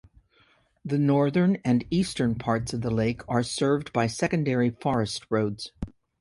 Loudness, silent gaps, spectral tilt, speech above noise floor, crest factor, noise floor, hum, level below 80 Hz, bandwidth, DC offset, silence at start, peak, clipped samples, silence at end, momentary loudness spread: -26 LUFS; none; -6 dB/octave; 38 dB; 16 dB; -63 dBFS; none; -50 dBFS; 11.5 kHz; under 0.1%; 0.85 s; -10 dBFS; under 0.1%; 0.3 s; 8 LU